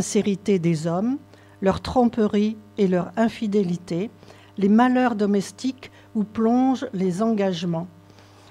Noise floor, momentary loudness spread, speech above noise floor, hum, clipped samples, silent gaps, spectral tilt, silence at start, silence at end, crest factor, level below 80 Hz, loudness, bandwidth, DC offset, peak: -49 dBFS; 11 LU; 27 dB; none; under 0.1%; none; -6.5 dB/octave; 0 s; 0.6 s; 16 dB; -52 dBFS; -23 LUFS; 12 kHz; under 0.1%; -6 dBFS